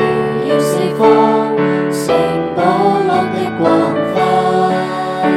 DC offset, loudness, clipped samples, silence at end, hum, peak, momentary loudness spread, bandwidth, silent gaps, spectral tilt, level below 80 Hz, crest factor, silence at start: under 0.1%; -14 LUFS; under 0.1%; 0 s; none; 0 dBFS; 5 LU; 15.5 kHz; none; -6 dB/octave; -52 dBFS; 14 dB; 0 s